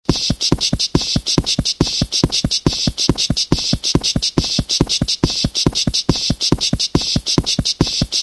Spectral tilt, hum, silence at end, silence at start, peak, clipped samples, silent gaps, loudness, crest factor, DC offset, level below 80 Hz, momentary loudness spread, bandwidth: -3.5 dB/octave; none; 0 s; 0.1 s; 0 dBFS; under 0.1%; none; -16 LUFS; 18 dB; under 0.1%; -30 dBFS; 2 LU; 11 kHz